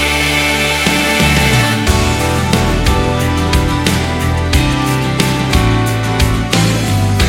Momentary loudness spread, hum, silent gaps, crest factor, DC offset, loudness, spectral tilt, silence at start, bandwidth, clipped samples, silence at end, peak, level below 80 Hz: 4 LU; none; none; 12 dB; under 0.1%; -13 LUFS; -4.5 dB/octave; 0 s; 16.5 kHz; under 0.1%; 0 s; 0 dBFS; -20 dBFS